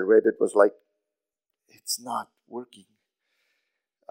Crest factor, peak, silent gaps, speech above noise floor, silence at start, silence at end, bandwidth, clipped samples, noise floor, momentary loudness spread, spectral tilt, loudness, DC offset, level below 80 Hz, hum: 22 dB; -4 dBFS; none; 63 dB; 0 s; 1.45 s; 16 kHz; under 0.1%; -87 dBFS; 20 LU; -3 dB/octave; -24 LUFS; under 0.1%; under -90 dBFS; none